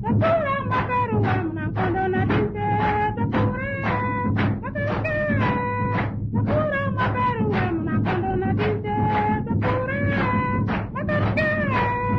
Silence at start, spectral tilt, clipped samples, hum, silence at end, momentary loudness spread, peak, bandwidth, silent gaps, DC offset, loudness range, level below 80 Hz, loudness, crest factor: 0 s; -9.5 dB/octave; under 0.1%; none; 0 s; 3 LU; -10 dBFS; 5.8 kHz; none; under 0.1%; 1 LU; -40 dBFS; -23 LUFS; 12 dB